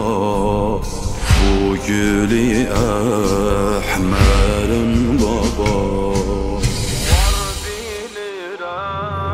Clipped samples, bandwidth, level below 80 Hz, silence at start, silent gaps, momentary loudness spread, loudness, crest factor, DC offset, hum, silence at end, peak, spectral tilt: under 0.1%; 16 kHz; -22 dBFS; 0 s; none; 10 LU; -18 LUFS; 16 dB; under 0.1%; none; 0 s; 0 dBFS; -5.5 dB/octave